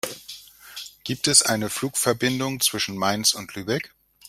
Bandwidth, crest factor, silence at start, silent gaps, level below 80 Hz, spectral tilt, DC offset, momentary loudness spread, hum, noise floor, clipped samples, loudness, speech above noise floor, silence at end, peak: 16 kHz; 24 dB; 0.05 s; none; -60 dBFS; -2 dB/octave; under 0.1%; 21 LU; none; -43 dBFS; under 0.1%; -22 LUFS; 20 dB; 0.4 s; -2 dBFS